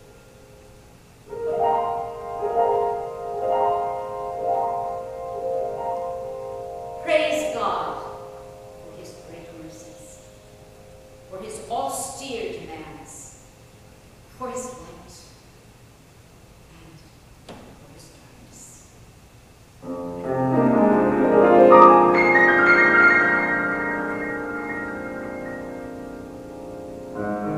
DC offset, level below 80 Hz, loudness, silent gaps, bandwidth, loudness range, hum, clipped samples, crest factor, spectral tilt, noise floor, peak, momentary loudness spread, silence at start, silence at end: under 0.1%; -54 dBFS; -20 LUFS; none; 15 kHz; 25 LU; none; under 0.1%; 22 dB; -5.5 dB/octave; -49 dBFS; 0 dBFS; 26 LU; 1.25 s; 0 s